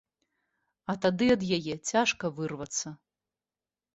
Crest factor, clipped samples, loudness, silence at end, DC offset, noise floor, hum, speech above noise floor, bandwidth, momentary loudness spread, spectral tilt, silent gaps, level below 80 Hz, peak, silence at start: 20 dB; under 0.1%; -29 LUFS; 1 s; under 0.1%; under -90 dBFS; none; over 61 dB; 8.2 kHz; 11 LU; -4 dB/octave; none; -64 dBFS; -12 dBFS; 0.9 s